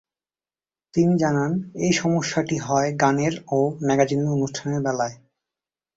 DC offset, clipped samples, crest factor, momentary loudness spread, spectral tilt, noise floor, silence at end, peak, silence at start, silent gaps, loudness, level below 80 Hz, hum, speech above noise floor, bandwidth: under 0.1%; under 0.1%; 20 dB; 6 LU; -5.5 dB/octave; under -90 dBFS; 0.8 s; -4 dBFS; 0.95 s; none; -22 LUFS; -58 dBFS; none; over 68 dB; 8 kHz